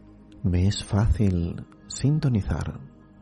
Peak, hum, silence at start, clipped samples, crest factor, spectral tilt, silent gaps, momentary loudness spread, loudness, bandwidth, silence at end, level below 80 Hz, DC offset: -12 dBFS; none; 0.3 s; under 0.1%; 14 dB; -6.5 dB/octave; none; 13 LU; -25 LUFS; 11.5 kHz; 0.35 s; -36 dBFS; under 0.1%